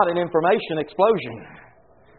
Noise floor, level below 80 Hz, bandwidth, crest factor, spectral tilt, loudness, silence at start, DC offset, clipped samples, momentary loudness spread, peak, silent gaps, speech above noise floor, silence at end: -54 dBFS; -60 dBFS; 4.4 kHz; 18 dB; -4 dB/octave; -21 LUFS; 0 s; under 0.1%; under 0.1%; 13 LU; -4 dBFS; none; 32 dB; 0.6 s